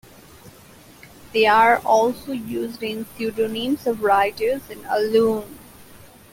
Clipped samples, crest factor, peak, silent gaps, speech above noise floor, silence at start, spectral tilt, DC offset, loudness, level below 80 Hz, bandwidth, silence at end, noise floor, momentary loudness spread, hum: under 0.1%; 18 dB; -4 dBFS; none; 27 dB; 0.45 s; -4.5 dB/octave; under 0.1%; -20 LUFS; -56 dBFS; 17 kHz; 0.35 s; -47 dBFS; 13 LU; none